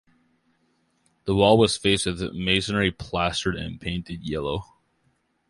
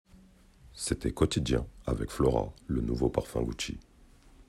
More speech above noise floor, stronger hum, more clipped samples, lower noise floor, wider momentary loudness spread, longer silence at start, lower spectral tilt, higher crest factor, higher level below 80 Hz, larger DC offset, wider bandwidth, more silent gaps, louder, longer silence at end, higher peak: first, 45 dB vs 27 dB; neither; neither; first, -69 dBFS vs -57 dBFS; first, 13 LU vs 9 LU; first, 1.25 s vs 0.65 s; about the same, -4.5 dB/octave vs -5.5 dB/octave; about the same, 22 dB vs 22 dB; about the same, -44 dBFS vs -42 dBFS; neither; second, 11.5 kHz vs 14 kHz; neither; first, -24 LUFS vs -31 LUFS; first, 0.85 s vs 0.05 s; first, -4 dBFS vs -10 dBFS